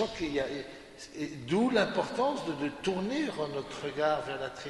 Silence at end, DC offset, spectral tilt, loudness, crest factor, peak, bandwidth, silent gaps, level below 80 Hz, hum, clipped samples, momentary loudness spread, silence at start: 0 s; under 0.1%; -5 dB/octave; -32 LUFS; 20 dB; -12 dBFS; 11.5 kHz; none; -60 dBFS; none; under 0.1%; 12 LU; 0 s